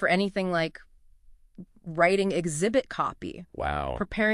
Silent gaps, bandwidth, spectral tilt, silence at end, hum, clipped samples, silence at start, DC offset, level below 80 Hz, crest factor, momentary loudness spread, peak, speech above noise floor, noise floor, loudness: none; 11.5 kHz; -5 dB/octave; 0 s; none; under 0.1%; 0 s; under 0.1%; -48 dBFS; 20 dB; 14 LU; -8 dBFS; 27 dB; -54 dBFS; -27 LUFS